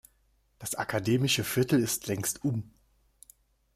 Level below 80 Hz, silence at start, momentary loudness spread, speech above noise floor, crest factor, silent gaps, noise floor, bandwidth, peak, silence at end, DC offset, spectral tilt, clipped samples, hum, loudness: -62 dBFS; 0.6 s; 10 LU; 40 dB; 16 dB; none; -69 dBFS; 16 kHz; -14 dBFS; 1.05 s; under 0.1%; -4.5 dB/octave; under 0.1%; none; -29 LUFS